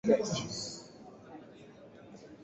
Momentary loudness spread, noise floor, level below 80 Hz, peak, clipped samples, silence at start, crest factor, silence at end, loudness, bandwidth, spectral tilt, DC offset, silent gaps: 24 LU; -54 dBFS; -68 dBFS; -14 dBFS; under 0.1%; 0.05 s; 24 dB; 0 s; -34 LUFS; 8 kHz; -5 dB/octave; under 0.1%; none